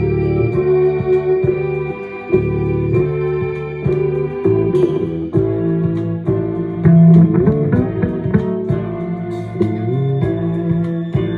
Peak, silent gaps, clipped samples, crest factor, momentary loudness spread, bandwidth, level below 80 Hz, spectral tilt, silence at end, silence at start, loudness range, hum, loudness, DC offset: -2 dBFS; none; under 0.1%; 14 dB; 8 LU; 4.1 kHz; -38 dBFS; -11 dB/octave; 0 s; 0 s; 4 LU; none; -16 LUFS; under 0.1%